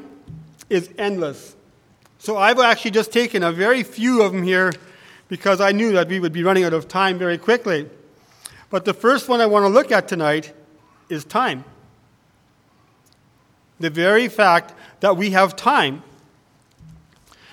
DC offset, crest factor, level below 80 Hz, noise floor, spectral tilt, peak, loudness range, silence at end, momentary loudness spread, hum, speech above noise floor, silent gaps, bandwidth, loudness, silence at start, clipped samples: under 0.1%; 20 dB; -64 dBFS; -58 dBFS; -5 dB/octave; 0 dBFS; 6 LU; 1.5 s; 12 LU; none; 40 dB; none; 18 kHz; -18 LUFS; 0 s; under 0.1%